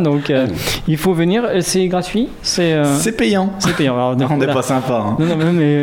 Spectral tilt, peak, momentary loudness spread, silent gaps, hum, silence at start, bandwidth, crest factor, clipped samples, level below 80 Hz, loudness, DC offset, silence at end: -5.5 dB/octave; -2 dBFS; 4 LU; none; none; 0 s; 17 kHz; 14 dB; under 0.1%; -40 dBFS; -16 LUFS; under 0.1%; 0 s